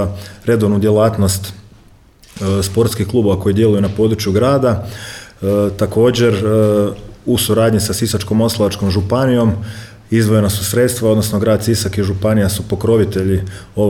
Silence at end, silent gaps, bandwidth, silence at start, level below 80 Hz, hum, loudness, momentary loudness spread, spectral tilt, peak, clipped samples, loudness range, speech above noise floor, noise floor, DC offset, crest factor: 0 s; none; 18.5 kHz; 0 s; -38 dBFS; none; -15 LUFS; 9 LU; -6 dB/octave; -2 dBFS; under 0.1%; 2 LU; 31 dB; -45 dBFS; under 0.1%; 12 dB